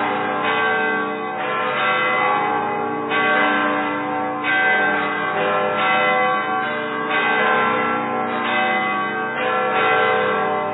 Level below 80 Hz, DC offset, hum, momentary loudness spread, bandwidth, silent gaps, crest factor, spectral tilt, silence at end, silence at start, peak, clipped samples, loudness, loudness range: -68 dBFS; under 0.1%; none; 6 LU; 4.1 kHz; none; 14 dB; -7.5 dB/octave; 0 s; 0 s; -6 dBFS; under 0.1%; -19 LUFS; 1 LU